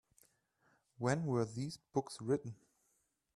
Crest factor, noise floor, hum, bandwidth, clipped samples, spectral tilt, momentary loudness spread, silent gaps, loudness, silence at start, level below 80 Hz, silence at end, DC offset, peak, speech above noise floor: 20 dB; -80 dBFS; none; 13 kHz; under 0.1%; -6.5 dB/octave; 10 LU; none; -39 LUFS; 1 s; -74 dBFS; 0.85 s; under 0.1%; -22 dBFS; 42 dB